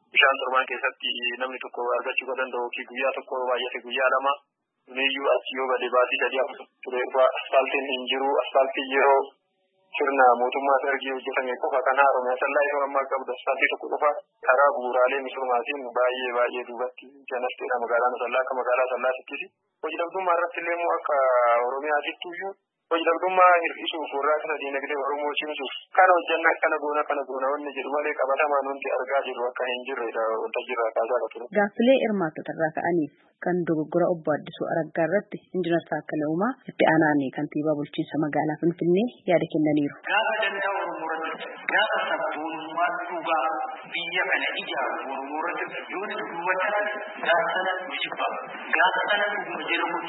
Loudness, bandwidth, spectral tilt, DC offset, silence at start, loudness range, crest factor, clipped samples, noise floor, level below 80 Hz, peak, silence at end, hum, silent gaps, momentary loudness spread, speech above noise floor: -25 LUFS; 4.1 kHz; -9 dB/octave; under 0.1%; 0.15 s; 4 LU; 20 dB; under 0.1%; -70 dBFS; -82 dBFS; -4 dBFS; 0 s; none; none; 10 LU; 45 dB